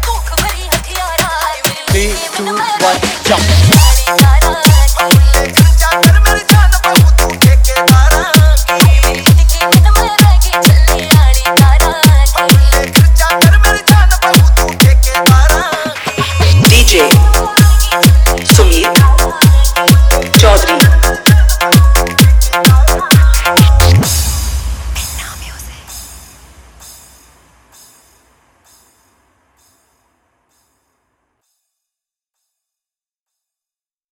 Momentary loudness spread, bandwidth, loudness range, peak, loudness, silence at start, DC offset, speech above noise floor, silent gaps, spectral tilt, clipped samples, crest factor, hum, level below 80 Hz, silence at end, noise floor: 8 LU; over 20 kHz; 5 LU; 0 dBFS; -8 LUFS; 0 s; under 0.1%; over 80 dB; none; -4.5 dB/octave; 0.4%; 8 dB; none; -12 dBFS; 7.95 s; under -90 dBFS